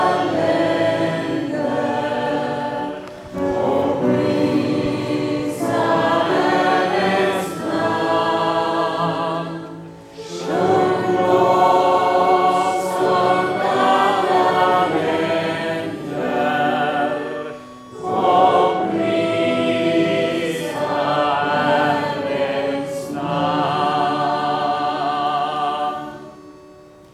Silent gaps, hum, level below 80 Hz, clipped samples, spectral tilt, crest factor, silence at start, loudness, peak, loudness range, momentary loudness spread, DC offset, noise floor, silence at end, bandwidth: none; none; -56 dBFS; under 0.1%; -5.5 dB/octave; 16 dB; 0 s; -19 LUFS; -2 dBFS; 5 LU; 10 LU; under 0.1%; -44 dBFS; 0.4 s; 14.5 kHz